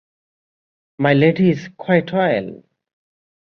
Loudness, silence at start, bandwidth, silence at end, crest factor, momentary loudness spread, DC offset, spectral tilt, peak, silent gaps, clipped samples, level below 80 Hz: -17 LUFS; 1 s; 6.6 kHz; 0.85 s; 18 dB; 10 LU; under 0.1%; -8.5 dB/octave; -2 dBFS; none; under 0.1%; -58 dBFS